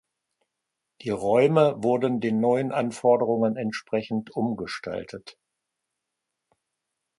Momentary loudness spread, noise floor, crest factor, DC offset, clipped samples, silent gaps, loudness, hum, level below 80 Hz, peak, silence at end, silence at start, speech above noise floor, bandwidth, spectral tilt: 13 LU; -83 dBFS; 20 dB; under 0.1%; under 0.1%; none; -24 LUFS; none; -66 dBFS; -6 dBFS; 1.9 s; 1 s; 59 dB; 11.5 kHz; -7 dB/octave